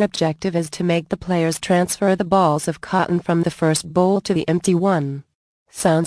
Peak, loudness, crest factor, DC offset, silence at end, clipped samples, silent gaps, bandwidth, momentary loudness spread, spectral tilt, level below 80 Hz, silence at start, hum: -4 dBFS; -19 LUFS; 16 dB; under 0.1%; 0 s; under 0.1%; 5.35-5.66 s; 11 kHz; 6 LU; -5.5 dB/octave; -52 dBFS; 0 s; none